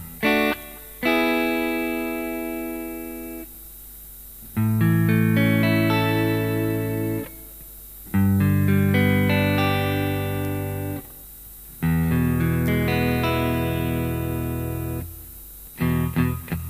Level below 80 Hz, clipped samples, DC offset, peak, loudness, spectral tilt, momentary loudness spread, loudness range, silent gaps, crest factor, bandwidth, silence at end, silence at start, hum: -40 dBFS; under 0.1%; under 0.1%; -6 dBFS; -23 LUFS; -6.5 dB/octave; 20 LU; 4 LU; none; 16 dB; 15.5 kHz; 0 s; 0 s; none